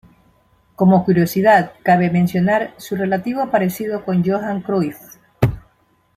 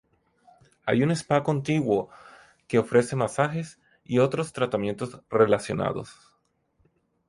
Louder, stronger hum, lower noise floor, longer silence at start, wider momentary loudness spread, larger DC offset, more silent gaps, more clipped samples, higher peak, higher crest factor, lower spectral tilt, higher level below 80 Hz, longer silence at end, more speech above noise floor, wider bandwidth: first, -17 LUFS vs -25 LUFS; neither; second, -59 dBFS vs -70 dBFS; about the same, 0.8 s vs 0.85 s; second, 8 LU vs 12 LU; neither; neither; neither; first, -2 dBFS vs -6 dBFS; about the same, 16 dB vs 20 dB; about the same, -7.5 dB/octave vs -6.5 dB/octave; first, -46 dBFS vs -60 dBFS; second, 0.55 s vs 1.15 s; second, 42 dB vs 46 dB; first, 15 kHz vs 11.5 kHz